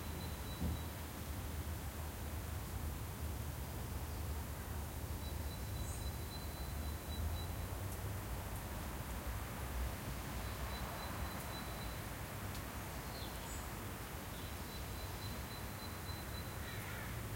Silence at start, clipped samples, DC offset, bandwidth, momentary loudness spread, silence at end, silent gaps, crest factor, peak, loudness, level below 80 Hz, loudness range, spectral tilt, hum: 0 s; under 0.1%; under 0.1%; 16.5 kHz; 2 LU; 0 s; none; 16 dB; -28 dBFS; -45 LUFS; -48 dBFS; 2 LU; -4.5 dB/octave; none